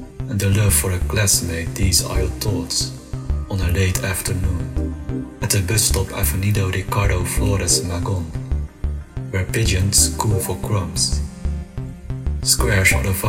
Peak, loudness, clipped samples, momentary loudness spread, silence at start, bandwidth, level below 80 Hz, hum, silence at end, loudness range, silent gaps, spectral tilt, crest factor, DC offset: -2 dBFS; -19 LUFS; under 0.1%; 12 LU; 0 s; 16.5 kHz; -26 dBFS; none; 0 s; 2 LU; none; -3.5 dB/octave; 18 dB; under 0.1%